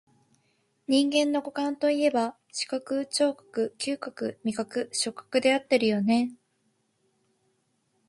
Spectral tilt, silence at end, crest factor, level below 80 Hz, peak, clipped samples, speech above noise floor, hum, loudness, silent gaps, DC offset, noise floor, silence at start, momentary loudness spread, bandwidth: -3.5 dB/octave; 1.75 s; 20 dB; -74 dBFS; -8 dBFS; under 0.1%; 46 dB; none; -27 LUFS; none; under 0.1%; -73 dBFS; 0.9 s; 8 LU; 11.5 kHz